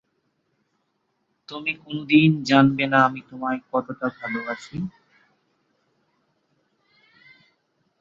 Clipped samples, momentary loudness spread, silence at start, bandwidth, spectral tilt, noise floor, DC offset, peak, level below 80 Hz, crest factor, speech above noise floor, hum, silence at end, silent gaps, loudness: under 0.1%; 15 LU; 1.5 s; 7.6 kHz; -6.5 dB/octave; -73 dBFS; under 0.1%; -2 dBFS; -64 dBFS; 24 dB; 51 dB; none; 3.1 s; none; -22 LUFS